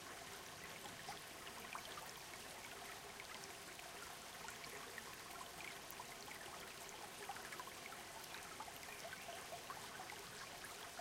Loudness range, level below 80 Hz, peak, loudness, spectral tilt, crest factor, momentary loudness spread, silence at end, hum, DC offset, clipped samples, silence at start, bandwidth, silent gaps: 1 LU; -76 dBFS; -32 dBFS; -51 LUFS; -1.5 dB/octave; 22 dB; 2 LU; 0 s; none; under 0.1%; under 0.1%; 0 s; 16.5 kHz; none